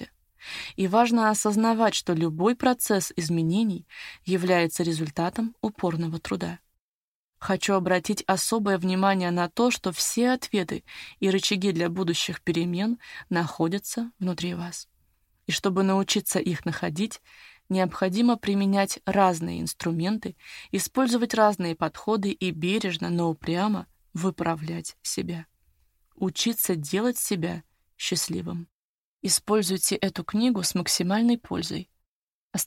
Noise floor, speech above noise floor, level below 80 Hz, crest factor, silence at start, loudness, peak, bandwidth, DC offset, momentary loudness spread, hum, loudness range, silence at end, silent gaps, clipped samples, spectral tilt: under -90 dBFS; over 65 dB; -60 dBFS; 20 dB; 0 s; -26 LUFS; -6 dBFS; 16.5 kHz; under 0.1%; 11 LU; none; 4 LU; 0 s; 6.80-7.33 s, 28.72-29.19 s, 32.08-32.51 s; under 0.1%; -4.5 dB/octave